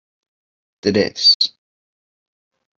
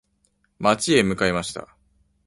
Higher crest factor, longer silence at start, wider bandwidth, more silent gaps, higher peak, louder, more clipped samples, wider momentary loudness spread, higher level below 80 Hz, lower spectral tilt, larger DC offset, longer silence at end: about the same, 20 dB vs 20 dB; first, 0.85 s vs 0.6 s; second, 7.6 kHz vs 11.5 kHz; first, 1.35-1.40 s vs none; about the same, -2 dBFS vs -4 dBFS; first, -15 LUFS vs -21 LUFS; neither; second, 9 LU vs 13 LU; second, -62 dBFS vs -50 dBFS; about the same, -3.5 dB/octave vs -4 dB/octave; neither; first, 1.3 s vs 0.6 s